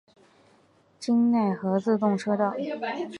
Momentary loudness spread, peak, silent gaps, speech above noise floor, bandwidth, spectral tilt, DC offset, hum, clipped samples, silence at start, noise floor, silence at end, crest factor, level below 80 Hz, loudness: 9 LU; -10 dBFS; none; 36 dB; 10.5 kHz; -7 dB/octave; under 0.1%; none; under 0.1%; 1 s; -61 dBFS; 0 s; 16 dB; -76 dBFS; -26 LUFS